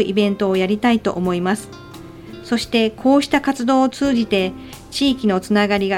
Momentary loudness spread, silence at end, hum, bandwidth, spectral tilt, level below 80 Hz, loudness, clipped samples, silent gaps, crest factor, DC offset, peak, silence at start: 20 LU; 0 s; none; 16.5 kHz; -5.5 dB/octave; -46 dBFS; -18 LUFS; under 0.1%; none; 16 dB; under 0.1%; -2 dBFS; 0 s